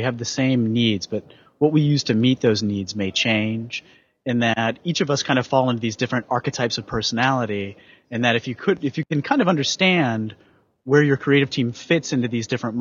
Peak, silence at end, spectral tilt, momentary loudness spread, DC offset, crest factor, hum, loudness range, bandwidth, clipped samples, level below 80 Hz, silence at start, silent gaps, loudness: -4 dBFS; 0 s; -5 dB/octave; 9 LU; under 0.1%; 18 dB; none; 2 LU; 7.6 kHz; under 0.1%; -58 dBFS; 0 s; none; -21 LUFS